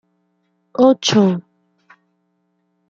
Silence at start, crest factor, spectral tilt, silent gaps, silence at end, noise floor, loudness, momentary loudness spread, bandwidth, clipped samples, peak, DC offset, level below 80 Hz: 0.8 s; 18 dB; -5 dB/octave; none; 1.5 s; -67 dBFS; -15 LUFS; 14 LU; 7.6 kHz; under 0.1%; -2 dBFS; under 0.1%; -64 dBFS